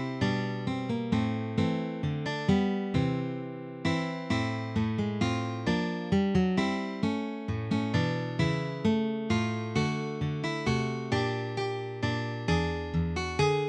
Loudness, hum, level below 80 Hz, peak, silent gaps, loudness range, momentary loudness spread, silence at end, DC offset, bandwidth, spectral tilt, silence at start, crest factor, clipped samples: -30 LUFS; none; -50 dBFS; -12 dBFS; none; 1 LU; 5 LU; 0 s; under 0.1%; 9.8 kHz; -6.5 dB/octave; 0 s; 18 dB; under 0.1%